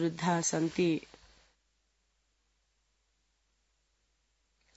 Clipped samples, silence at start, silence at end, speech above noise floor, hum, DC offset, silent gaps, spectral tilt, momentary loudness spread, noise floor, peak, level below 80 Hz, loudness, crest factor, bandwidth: under 0.1%; 0 s; 3.75 s; 46 dB; none; under 0.1%; none; -5.5 dB/octave; 2 LU; -76 dBFS; -16 dBFS; -70 dBFS; -31 LUFS; 22 dB; 8 kHz